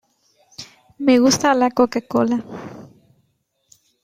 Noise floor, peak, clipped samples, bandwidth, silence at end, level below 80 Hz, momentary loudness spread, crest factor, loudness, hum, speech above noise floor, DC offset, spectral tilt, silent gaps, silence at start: -68 dBFS; -2 dBFS; under 0.1%; 15 kHz; 1.15 s; -60 dBFS; 24 LU; 18 dB; -17 LUFS; none; 51 dB; under 0.1%; -4 dB/octave; none; 0.6 s